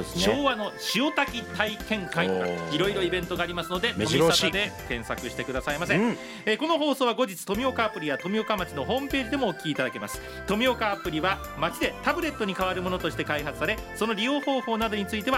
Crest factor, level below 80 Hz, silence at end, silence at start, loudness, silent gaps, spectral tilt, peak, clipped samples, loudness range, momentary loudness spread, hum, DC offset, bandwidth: 22 dB; -48 dBFS; 0 s; 0 s; -27 LUFS; none; -4 dB/octave; -6 dBFS; under 0.1%; 2 LU; 6 LU; none; under 0.1%; 16 kHz